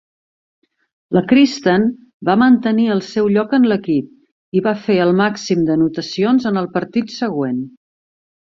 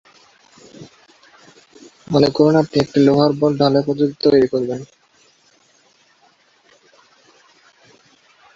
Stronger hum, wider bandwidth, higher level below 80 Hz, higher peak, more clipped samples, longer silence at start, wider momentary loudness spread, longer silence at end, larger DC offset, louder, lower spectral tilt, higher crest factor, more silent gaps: neither; about the same, 7.4 kHz vs 7.6 kHz; about the same, -56 dBFS vs -56 dBFS; about the same, 0 dBFS vs 0 dBFS; neither; first, 1.1 s vs 0.8 s; about the same, 9 LU vs 7 LU; second, 0.85 s vs 3.7 s; neither; about the same, -16 LUFS vs -16 LUFS; about the same, -6.5 dB/octave vs -7 dB/octave; about the same, 16 dB vs 20 dB; first, 2.14-2.20 s, 4.32-4.52 s vs none